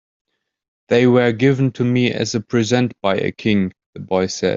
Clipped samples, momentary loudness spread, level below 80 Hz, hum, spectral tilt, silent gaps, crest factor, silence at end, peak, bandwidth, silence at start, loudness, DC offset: under 0.1%; 7 LU; -56 dBFS; none; -6 dB/octave; 3.86-3.93 s; 16 dB; 0 s; -2 dBFS; 7.8 kHz; 0.9 s; -18 LUFS; under 0.1%